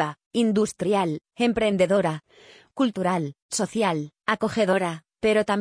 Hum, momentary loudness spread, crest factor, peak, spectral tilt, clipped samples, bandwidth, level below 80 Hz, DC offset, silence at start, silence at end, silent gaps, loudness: none; 7 LU; 16 dB; -8 dBFS; -5 dB/octave; under 0.1%; 10.5 kHz; -58 dBFS; under 0.1%; 0 s; 0 s; 0.26-0.31 s, 3.42-3.49 s; -24 LUFS